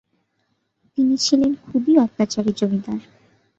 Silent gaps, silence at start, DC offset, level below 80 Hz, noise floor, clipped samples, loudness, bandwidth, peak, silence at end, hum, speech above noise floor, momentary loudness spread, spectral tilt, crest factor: none; 0.95 s; under 0.1%; -58 dBFS; -70 dBFS; under 0.1%; -20 LUFS; 8 kHz; -4 dBFS; 0.55 s; none; 51 dB; 12 LU; -5 dB/octave; 18 dB